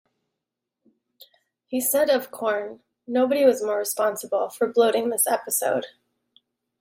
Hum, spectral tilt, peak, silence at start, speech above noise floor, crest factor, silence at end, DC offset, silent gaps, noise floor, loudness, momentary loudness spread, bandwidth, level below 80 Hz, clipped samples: none; -2 dB/octave; -6 dBFS; 1.7 s; 62 dB; 18 dB; 0.9 s; under 0.1%; none; -84 dBFS; -23 LUFS; 9 LU; 16.5 kHz; -76 dBFS; under 0.1%